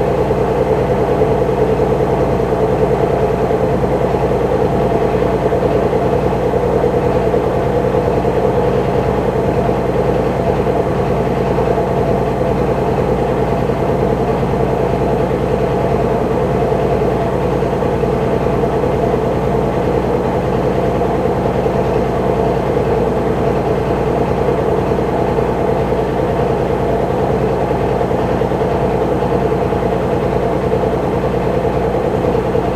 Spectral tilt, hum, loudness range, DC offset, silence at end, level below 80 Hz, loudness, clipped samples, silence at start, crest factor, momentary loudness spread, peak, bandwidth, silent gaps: -8 dB/octave; 60 Hz at -30 dBFS; 1 LU; under 0.1%; 0 s; -28 dBFS; -15 LUFS; under 0.1%; 0 s; 14 dB; 2 LU; -2 dBFS; 14 kHz; none